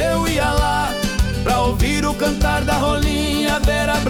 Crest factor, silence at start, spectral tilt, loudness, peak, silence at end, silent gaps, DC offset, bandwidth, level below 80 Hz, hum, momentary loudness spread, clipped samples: 12 dB; 0 s; -4.5 dB/octave; -18 LUFS; -6 dBFS; 0 s; none; under 0.1%; 19.5 kHz; -24 dBFS; none; 2 LU; under 0.1%